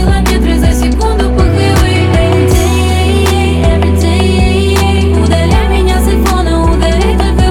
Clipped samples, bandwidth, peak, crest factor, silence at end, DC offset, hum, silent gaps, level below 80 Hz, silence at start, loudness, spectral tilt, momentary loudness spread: under 0.1%; 16 kHz; 0 dBFS; 8 dB; 0 s; 0.6%; none; none; -12 dBFS; 0 s; -10 LUFS; -6 dB/octave; 2 LU